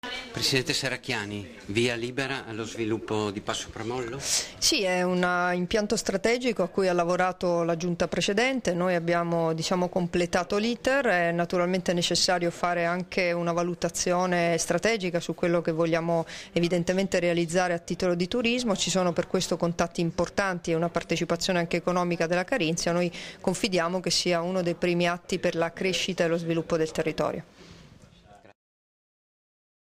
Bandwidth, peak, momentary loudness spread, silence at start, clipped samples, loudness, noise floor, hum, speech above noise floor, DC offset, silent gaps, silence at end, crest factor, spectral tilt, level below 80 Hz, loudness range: 16 kHz; -10 dBFS; 6 LU; 0.05 s; under 0.1%; -26 LUFS; -53 dBFS; none; 27 dB; under 0.1%; none; 1.5 s; 16 dB; -4 dB/octave; -54 dBFS; 3 LU